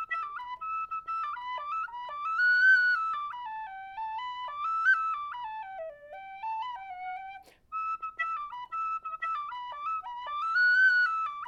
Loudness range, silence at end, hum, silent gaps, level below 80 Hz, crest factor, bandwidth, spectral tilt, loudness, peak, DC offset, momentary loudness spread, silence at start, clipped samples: 10 LU; 0 s; none; none; -70 dBFS; 16 dB; 8 kHz; 0 dB/octave; -29 LUFS; -16 dBFS; under 0.1%; 18 LU; 0 s; under 0.1%